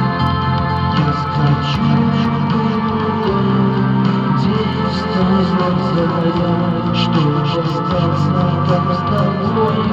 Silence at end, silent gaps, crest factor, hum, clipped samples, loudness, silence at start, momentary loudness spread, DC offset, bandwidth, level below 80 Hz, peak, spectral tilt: 0 s; none; 12 dB; none; under 0.1%; -16 LUFS; 0 s; 2 LU; under 0.1%; 7.4 kHz; -40 dBFS; -2 dBFS; -8 dB/octave